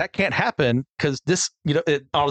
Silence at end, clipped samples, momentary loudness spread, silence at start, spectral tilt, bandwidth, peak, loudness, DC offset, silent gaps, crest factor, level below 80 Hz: 0 s; under 0.1%; 3 LU; 0 s; -4.5 dB/octave; 9.4 kHz; -6 dBFS; -22 LUFS; under 0.1%; 0.90-0.97 s; 16 dB; -54 dBFS